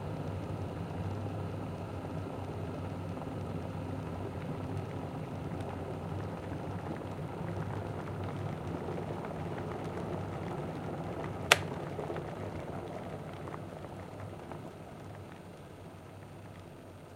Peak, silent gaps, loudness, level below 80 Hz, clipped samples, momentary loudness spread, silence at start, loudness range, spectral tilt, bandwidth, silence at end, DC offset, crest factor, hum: 0 dBFS; none; -39 LUFS; -58 dBFS; under 0.1%; 9 LU; 0 s; 10 LU; -5 dB/octave; 16 kHz; 0 s; under 0.1%; 38 dB; none